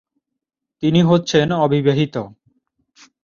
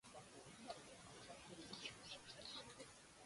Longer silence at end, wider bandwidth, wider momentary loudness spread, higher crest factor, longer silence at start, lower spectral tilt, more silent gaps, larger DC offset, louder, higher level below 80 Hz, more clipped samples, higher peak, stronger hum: first, 0.95 s vs 0 s; second, 7.4 kHz vs 11.5 kHz; first, 10 LU vs 7 LU; second, 16 dB vs 22 dB; first, 0.8 s vs 0.05 s; first, -6.5 dB/octave vs -2.5 dB/octave; neither; neither; first, -17 LUFS vs -56 LUFS; first, -54 dBFS vs -78 dBFS; neither; first, -2 dBFS vs -36 dBFS; neither